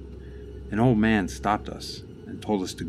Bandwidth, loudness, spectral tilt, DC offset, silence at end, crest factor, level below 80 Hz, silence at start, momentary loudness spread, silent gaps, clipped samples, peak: 13.5 kHz; -25 LUFS; -6 dB/octave; under 0.1%; 0 s; 18 dB; -42 dBFS; 0 s; 20 LU; none; under 0.1%; -8 dBFS